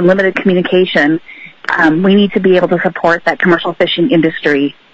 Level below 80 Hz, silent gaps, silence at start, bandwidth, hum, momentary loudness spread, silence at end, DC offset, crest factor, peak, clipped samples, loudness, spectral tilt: -52 dBFS; none; 0 s; 7.8 kHz; none; 4 LU; 0.2 s; under 0.1%; 12 dB; 0 dBFS; under 0.1%; -11 LUFS; -7 dB/octave